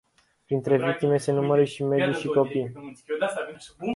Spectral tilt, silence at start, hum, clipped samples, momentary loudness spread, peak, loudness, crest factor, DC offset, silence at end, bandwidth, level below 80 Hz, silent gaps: -6.5 dB/octave; 0.5 s; none; under 0.1%; 12 LU; -8 dBFS; -25 LUFS; 16 dB; under 0.1%; 0 s; 11.5 kHz; -66 dBFS; none